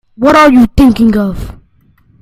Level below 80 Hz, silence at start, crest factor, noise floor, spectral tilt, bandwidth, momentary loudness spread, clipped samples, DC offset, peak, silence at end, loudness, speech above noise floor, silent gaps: -26 dBFS; 0.2 s; 8 dB; -48 dBFS; -6.5 dB/octave; 15 kHz; 17 LU; 0.7%; under 0.1%; 0 dBFS; 0.7 s; -7 LUFS; 41 dB; none